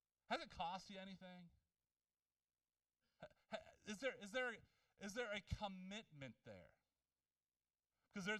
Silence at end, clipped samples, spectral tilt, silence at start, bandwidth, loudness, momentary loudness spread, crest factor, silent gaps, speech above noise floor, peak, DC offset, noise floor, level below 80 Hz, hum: 0 s; under 0.1%; -4 dB/octave; 0.3 s; 13 kHz; -51 LUFS; 16 LU; 22 dB; none; over 39 dB; -30 dBFS; under 0.1%; under -90 dBFS; -70 dBFS; none